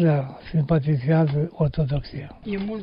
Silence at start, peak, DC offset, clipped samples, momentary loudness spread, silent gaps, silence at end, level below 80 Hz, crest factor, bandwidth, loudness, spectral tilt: 0 s; -8 dBFS; under 0.1%; under 0.1%; 10 LU; none; 0 s; -42 dBFS; 14 dB; 5.4 kHz; -23 LUFS; -12 dB/octave